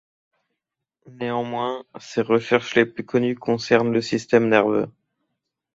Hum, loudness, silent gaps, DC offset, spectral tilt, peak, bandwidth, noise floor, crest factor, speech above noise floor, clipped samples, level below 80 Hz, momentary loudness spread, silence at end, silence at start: none; -21 LUFS; none; under 0.1%; -6 dB/octave; -2 dBFS; 7.8 kHz; -83 dBFS; 22 dB; 62 dB; under 0.1%; -62 dBFS; 10 LU; 0.85 s; 1.05 s